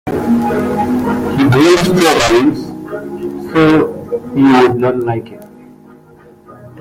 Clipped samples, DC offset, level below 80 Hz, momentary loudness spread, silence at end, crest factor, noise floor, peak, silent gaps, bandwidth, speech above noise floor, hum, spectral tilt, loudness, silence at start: under 0.1%; under 0.1%; -40 dBFS; 15 LU; 0 s; 14 dB; -41 dBFS; 0 dBFS; none; 16.5 kHz; 31 dB; none; -5.5 dB/octave; -12 LUFS; 0.05 s